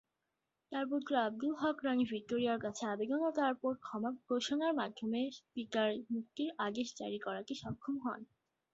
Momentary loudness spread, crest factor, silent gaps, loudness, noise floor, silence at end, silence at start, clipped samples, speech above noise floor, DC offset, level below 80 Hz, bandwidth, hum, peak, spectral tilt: 7 LU; 18 dB; none; -38 LUFS; -87 dBFS; 0.5 s; 0.7 s; under 0.1%; 50 dB; under 0.1%; -76 dBFS; 7.6 kHz; none; -20 dBFS; -3.5 dB/octave